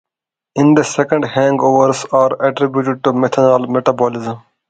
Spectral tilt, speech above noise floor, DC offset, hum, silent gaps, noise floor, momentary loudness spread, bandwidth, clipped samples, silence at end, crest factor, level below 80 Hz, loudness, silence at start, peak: -6 dB/octave; 71 dB; under 0.1%; none; none; -85 dBFS; 6 LU; 9.2 kHz; under 0.1%; 0.3 s; 14 dB; -58 dBFS; -14 LUFS; 0.55 s; 0 dBFS